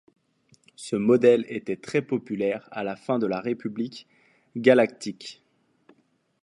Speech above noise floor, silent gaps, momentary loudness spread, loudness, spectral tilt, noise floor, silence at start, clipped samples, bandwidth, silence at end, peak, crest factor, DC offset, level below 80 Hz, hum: 42 dB; none; 18 LU; -25 LUFS; -6 dB/octave; -66 dBFS; 0.8 s; under 0.1%; 11.5 kHz; 1.1 s; -2 dBFS; 24 dB; under 0.1%; -72 dBFS; none